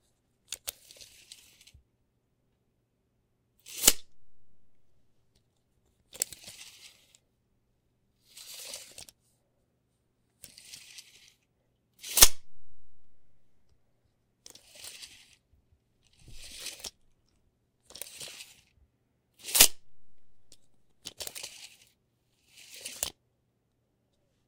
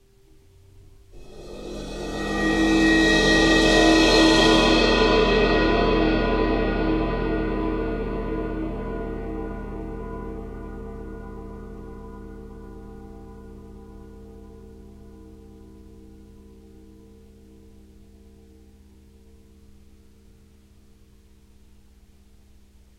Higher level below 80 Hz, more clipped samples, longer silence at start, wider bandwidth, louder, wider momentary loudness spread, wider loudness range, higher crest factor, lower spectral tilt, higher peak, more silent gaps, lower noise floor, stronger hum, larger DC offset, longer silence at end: second, -52 dBFS vs -34 dBFS; neither; second, 0.5 s vs 0.75 s; first, 17.5 kHz vs 13 kHz; second, -25 LUFS vs -20 LUFS; first, 29 LU vs 26 LU; second, 21 LU vs 24 LU; first, 32 dB vs 20 dB; second, 0.5 dB/octave vs -4.5 dB/octave; about the same, -2 dBFS vs -4 dBFS; neither; first, -75 dBFS vs -53 dBFS; neither; neither; second, 1.4 s vs 7.15 s